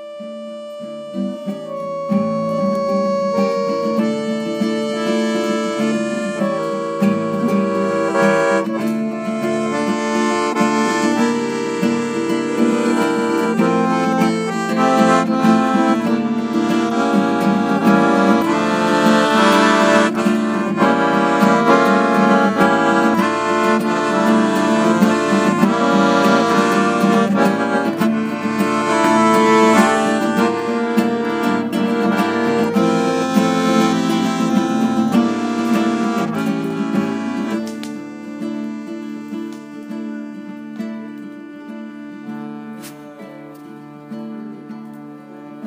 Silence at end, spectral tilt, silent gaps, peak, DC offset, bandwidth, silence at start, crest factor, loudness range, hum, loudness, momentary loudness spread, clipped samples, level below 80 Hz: 0 s; -5.5 dB/octave; none; 0 dBFS; under 0.1%; 15.5 kHz; 0 s; 16 dB; 14 LU; none; -16 LUFS; 17 LU; under 0.1%; -68 dBFS